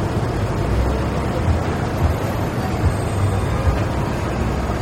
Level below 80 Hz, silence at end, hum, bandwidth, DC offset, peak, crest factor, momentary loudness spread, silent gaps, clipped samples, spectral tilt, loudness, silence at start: -26 dBFS; 0 s; none; 16 kHz; under 0.1%; -6 dBFS; 14 dB; 2 LU; none; under 0.1%; -7 dB/octave; -21 LUFS; 0 s